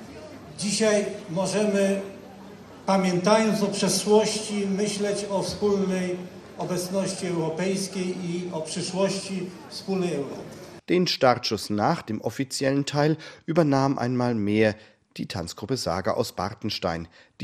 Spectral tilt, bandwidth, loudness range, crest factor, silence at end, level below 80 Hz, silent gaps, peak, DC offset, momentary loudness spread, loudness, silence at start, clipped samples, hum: -5 dB/octave; 14 kHz; 5 LU; 22 dB; 0 s; -60 dBFS; none; -4 dBFS; under 0.1%; 14 LU; -25 LUFS; 0 s; under 0.1%; none